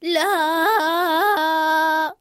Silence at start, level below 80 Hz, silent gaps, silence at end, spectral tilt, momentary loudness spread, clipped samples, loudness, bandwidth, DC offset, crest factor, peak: 0 s; -74 dBFS; none; 0.05 s; -1 dB/octave; 1 LU; under 0.1%; -18 LUFS; 16.5 kHz; under 0.1%; 12 dB; -6 dBFS